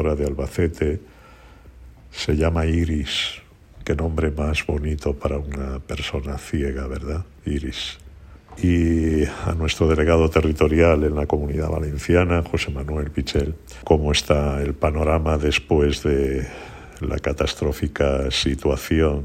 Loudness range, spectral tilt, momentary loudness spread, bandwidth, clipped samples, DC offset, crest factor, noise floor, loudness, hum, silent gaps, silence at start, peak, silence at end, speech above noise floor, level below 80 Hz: 6 LU; -6 dB/octave; 11 LU; 15 kHz; under 0.1%; under 0.1%; 20 dB; -46 dBFS; -22 LUFS; none; none; 0 s; -2 dBFS; 0 s; 25 dB; -30 dBFS